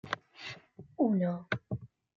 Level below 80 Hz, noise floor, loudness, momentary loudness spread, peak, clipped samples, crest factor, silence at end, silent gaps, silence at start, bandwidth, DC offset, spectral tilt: -68 dBFS; -51 dBFS; -34 LUFS; 17 LU; -14 dBFS; under 0.1%; 22 dB; 0.3 s; none; 0.05 s; 7.2 kHz; under 0.1%; -7.5 dB/octave